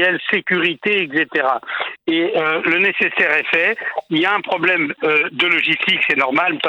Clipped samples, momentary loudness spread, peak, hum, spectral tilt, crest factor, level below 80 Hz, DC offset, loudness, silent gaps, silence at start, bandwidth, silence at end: under 0.1%; 5 LU; -2 dBFS; none; -5.5 dB/octave; 16 dB; -70 dBFS; under 0.1%; -16 LUFS; none; 0 s; 19 kHz; 0 s